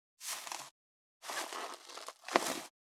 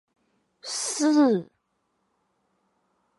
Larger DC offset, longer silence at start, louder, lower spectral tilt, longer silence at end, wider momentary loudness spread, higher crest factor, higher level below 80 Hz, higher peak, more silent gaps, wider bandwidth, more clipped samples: neither; second, 0.2 s vs 0.65 s; second, -39 LUFS vs -24 LUFS; second, -1 dB/octave vs -3.5 dB/octave; second, 0.2 s vs 1.75 s; about the same, 14 LU vs 13 LU; first, 36 dB vs 16 dB; second, under -90 dBFS vs -82 dBFS; first, -6 dBFS vs -12 dBFS; first, 0.71-1.20 s vs none; first, 19 kHz vs 11.5 kHz; neither